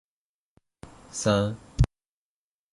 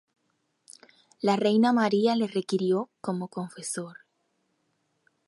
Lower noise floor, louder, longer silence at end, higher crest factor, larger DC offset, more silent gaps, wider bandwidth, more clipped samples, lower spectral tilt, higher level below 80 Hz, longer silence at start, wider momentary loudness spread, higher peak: first, under -90 dBFS vs -75 dBFS; about the same, -27 LUFS vs -26 LUFS; second, 0.9 s vs 1.35 s; about the same, 22 dB vs 18 dB; neither; neither; about the same, 11.5 kHz vs 11.5 kHz; neither; about the same, -5.5 dB/octave vs -5.5 dB/octave; first, -38 dBFS vs -78 dBFS; about the same, 1.15 s vs 1.25 s; second, 7 LU vs 13 LU; about the same, -8 dBFS vs -10 dBFS